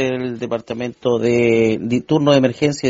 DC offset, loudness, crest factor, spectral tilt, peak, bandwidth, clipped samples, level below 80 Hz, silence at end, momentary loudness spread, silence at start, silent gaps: under 0.1%; -17 LUFS; 16 dB; -5.5 dB/octave; 0 dBFS; 7.8 kHz; under 0.1%; -54 dBFS; 0 s; 9 LU; 0 s; none